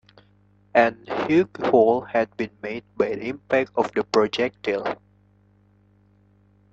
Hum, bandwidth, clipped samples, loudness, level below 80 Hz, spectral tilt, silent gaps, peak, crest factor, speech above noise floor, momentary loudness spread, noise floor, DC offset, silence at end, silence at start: 50 Hz at -50 dBFS; 7.8 kHz; under 0.1%; -23 LUFS; -62 dBFS; -6 dB/octave; none; -2 dBFS; 22 dB; 36 dB; 12 LU; -58 dBFS; under 0.1%; 1.8 s; 0.75 s